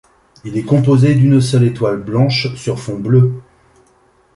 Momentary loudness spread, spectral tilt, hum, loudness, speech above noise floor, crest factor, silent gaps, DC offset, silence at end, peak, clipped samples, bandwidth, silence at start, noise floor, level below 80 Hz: 12 LU; -7.5 dB/octave; none; -14 LUFS; 40 dB; 12 dB; none; under 0.1%; 0.95 s; -2 dBFS; under 0.1%; 11.5 kHz; 0.45 s; -53 dBFS; -48 dBFS